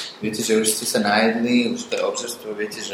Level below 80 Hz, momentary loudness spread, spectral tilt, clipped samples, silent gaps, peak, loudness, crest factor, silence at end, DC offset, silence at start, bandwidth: -66 dBFS; 10 LU; -3 dB/octave; under 0.1%; none; -2 dBFS; -21 LUFS; 18 dB; 0 s; under 0.1%; 0 s; 16.5 kHz